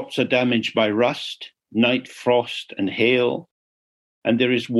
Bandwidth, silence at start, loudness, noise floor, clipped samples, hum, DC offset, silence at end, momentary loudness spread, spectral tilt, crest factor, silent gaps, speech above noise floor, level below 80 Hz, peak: 12 kHz; 0 s; -21 LUFS; under -90 dBFS; under 0.1%; none; under 0.1%; 0 s; 10 LU; -5.5 dB/octave; 18 dB; 3.51-4.22 s; over 69 dB; -68 dBFS; -4 dBFS